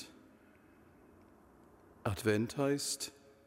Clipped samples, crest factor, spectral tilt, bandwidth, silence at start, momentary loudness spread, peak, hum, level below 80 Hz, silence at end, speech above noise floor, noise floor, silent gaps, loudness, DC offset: under 0.1%; 20 dB; -4.5 dB/octave; 16 kHz; 0 s; 10 LU; -20 dBFS; none; -66 dBFS; 0.35 s; 28 dB; -63 dBFS; none; -36 LUFS; under 0.1%